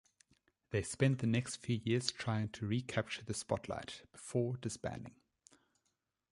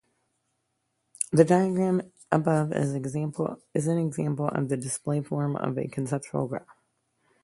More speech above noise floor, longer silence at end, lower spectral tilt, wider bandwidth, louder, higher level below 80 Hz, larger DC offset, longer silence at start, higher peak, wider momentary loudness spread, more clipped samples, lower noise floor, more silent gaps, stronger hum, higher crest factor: second, 47 dB vs 51 dB; first, 1.2 s vs 0.7 s; second, -5.5 dB/octave vs -7 dB/octave; about the same, 11.5 kHz vs 11.5 kHz; second, -38 LUFS vs -27 LUFS; about the same, -64 dBFS vs -66 dBFS; neither; second, 0.7 s vs 1.2 s; second, -14 dBFS vs -4 dBFS; about the same, 11 LU vs 9 LU; neither; first, -85 dBFS vs -77 dBFS; neither; neither; about the same, 24 dB vs 24 dB